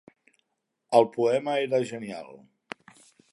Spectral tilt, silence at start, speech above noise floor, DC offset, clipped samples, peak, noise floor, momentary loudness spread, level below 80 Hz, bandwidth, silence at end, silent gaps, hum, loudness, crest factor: -5.5 dB/octave; 0.9 s; 53 dB; under 0.1%; under 0.1%; -4 dBFS; -79 dBFS; 21 LU; -78 dBFS; 11.5 kHz; 0.95 s; none; none; -25 LUFS; 24 dB